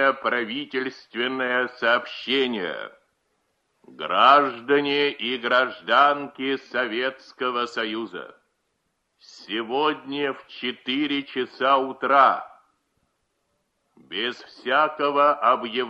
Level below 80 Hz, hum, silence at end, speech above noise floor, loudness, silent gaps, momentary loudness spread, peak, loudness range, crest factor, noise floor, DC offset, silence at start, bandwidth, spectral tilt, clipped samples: -74 dBFS; none; 0 s; 51 dB; -23 LUFS; none; 12 LU; -4 dBFS; 8 LU; 22 dB; -74 dBFS; under 0.1%; 0 s; 8 kHz; -4.5 dB/octave; under 0.1%